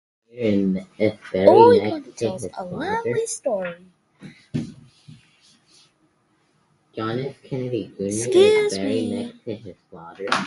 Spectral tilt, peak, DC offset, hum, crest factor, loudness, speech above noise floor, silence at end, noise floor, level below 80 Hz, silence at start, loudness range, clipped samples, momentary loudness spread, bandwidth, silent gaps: -5.5 dB/octave; 0 dBFS; under 0.1%; none; 22 dB; -21 LUFS; 44 dB; 0 s; -64 dBFS; -58 dBFS; 0.35 s; 15 LU; under 0.1%; 19 LU; 11.5 kHz; none